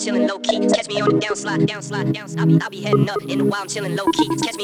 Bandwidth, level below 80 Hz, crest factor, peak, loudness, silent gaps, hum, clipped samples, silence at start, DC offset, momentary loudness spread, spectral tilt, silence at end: 14 kHz; -56 dBFS; 16 dB; -4 dBFS; -20 LUFS; none; none; under 0.1%; 0 s; under 0.1%; 6 LU; -5.5 dB/octave; 0 s